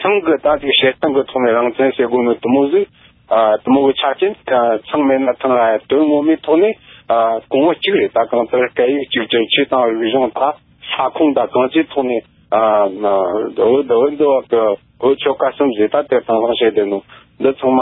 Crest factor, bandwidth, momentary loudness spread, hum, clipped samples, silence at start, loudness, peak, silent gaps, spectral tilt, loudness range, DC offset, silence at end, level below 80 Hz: 12 dB; 4.1 kHz; 6 LU; none; under 0.1%; 0 s; -15 LUFS; -2 dBFS; none; -10 dB/octave; 1 LU; under 0.1%; 0 s; -54 dBFS